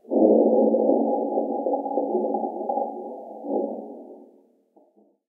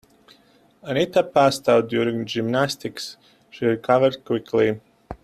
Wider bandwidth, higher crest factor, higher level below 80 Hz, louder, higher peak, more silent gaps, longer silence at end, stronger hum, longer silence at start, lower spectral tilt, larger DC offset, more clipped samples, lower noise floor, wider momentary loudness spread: second, 1 kHz vs 14.5 kHz; about the same, 18 dB vs 18 dB; second, under -90 dBFS vs -56 dBFS; about the same, -23 LUFS vs -21 LUFS; about the same, -6 dBFS vs -4 dBFS; neither; first, 1.05 s vs 0.1 s; neither; second, 0.1 s vs 0.85 s; first, -13.5 dB/octave vs -5.5 dB/octave; neither; neither; about the same, -60 dBFS vs -57 dBFS; first, 19 LU vs 15 LU